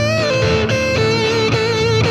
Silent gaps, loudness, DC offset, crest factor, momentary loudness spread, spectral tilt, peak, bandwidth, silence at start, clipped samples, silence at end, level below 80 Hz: none; -15 LUFS; under 0.1%; 12 dB; 1 LU; -5 dB/octave; -4 dBFS; 12 kHz; 0 s; under 0.1%; 0 s; -36 dBFS